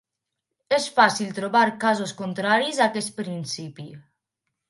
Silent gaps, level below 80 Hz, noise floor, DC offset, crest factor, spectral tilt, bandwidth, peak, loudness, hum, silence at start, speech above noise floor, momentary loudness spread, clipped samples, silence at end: none; -74 dBFS; -83 dBFS; under 0.1%; 22 dB; -3.5 dB/octave; 11.5 kHz; -4 dBFS; -23 LUFS; none; 0.7 s; 60 dB; 13 LU; under 0.1%; 0.7 s